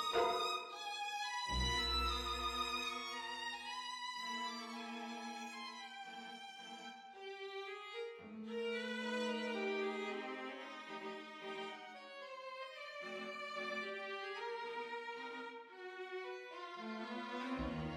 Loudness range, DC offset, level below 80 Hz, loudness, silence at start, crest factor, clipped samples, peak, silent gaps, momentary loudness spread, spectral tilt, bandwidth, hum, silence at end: 8 LU; under 0.1%; -56 dBFS; -43 LUFS; 0 s; 20 dB; under 0.1%; -24 dBFS; none; 12 LU; -3.5 dB/octave; 16 kHz; none; 0 s